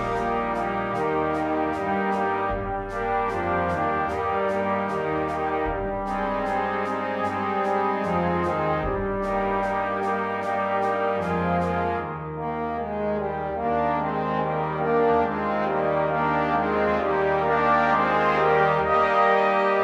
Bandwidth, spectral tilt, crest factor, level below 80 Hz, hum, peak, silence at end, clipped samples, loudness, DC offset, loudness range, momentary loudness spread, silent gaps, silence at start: 11.5 kHz; -7 dB/octave; 16 dB; -44 dBFS; none; -8 dBFS; 0 s; under 0.1%; -24 LUFS; under 0.1%; 4 LU; 7 LU; none; 0 s